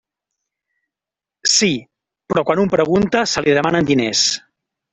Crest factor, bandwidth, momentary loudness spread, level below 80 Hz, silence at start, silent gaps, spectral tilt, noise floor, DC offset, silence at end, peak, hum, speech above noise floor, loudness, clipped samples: 18 dB; 8.4 kHz; 6 LU; -50 dBFS; 1.45 s; none; -3.5 dB/octave; -88 dBFS; under 0.1%; 0.55 s; -2 dBFS; none; 72 dB; -16 LUFS; under 0.1%